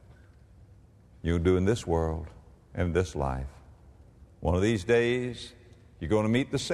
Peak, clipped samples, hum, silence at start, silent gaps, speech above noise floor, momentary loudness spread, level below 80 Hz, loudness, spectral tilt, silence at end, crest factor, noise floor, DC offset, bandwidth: -12 dBFS; under 0.1%; none; 1.25 s; none; 28 dB; 17 LU; -44 dBFS; -28 LUFS; -6.5 dB/octave; 0 s; 18 dB; -55 dBFS; under 0.1%; 12 kHz